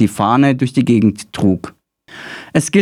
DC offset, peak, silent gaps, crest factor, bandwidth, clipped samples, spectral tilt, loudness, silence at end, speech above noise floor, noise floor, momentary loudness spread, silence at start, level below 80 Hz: under 0.1%; 0 dBFS; none; 14 dB; 15 kHz; under 0.1%; -6 dB/octave; -15 LUFS; 0 s; 24 dB; -38 dBFS; 18 LU; 0 s; -52 dBFS